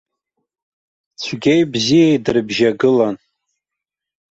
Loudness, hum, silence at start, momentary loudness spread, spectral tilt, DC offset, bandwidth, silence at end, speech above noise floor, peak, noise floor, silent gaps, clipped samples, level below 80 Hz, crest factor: -15 LUFS; none; 1.2 s; 12 LU; -5.5 dB/octave; under 0.1%; 8 kHz; 1.15 s; 69 dB; -2 dBFS; -84 dBFS; none; under 0.1%; -56 dBFS; 14 dB